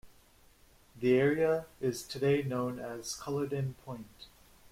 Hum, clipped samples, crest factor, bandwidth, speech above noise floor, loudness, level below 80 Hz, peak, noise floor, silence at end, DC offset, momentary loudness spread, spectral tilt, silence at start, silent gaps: none; under 0.1%; 18 dB; 16.5 kHz; 30 dB; -32 LUFS; -64 dBFS; -16 dBFS; -62 dBFS; 0.05 s; under 0.1%; 17 LU; -6 dB/octave; 0.05 s; none